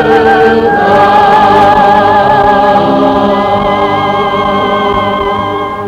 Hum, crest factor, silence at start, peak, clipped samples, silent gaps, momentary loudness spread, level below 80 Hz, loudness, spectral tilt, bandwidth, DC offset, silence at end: none; 8 dB; 0 s; 0 dBFS; 1%; none; 6 LU; -32 dBFS; -7 LUFS; -6.5 dB/octave; 11 kHz; under 0.1%; 0 s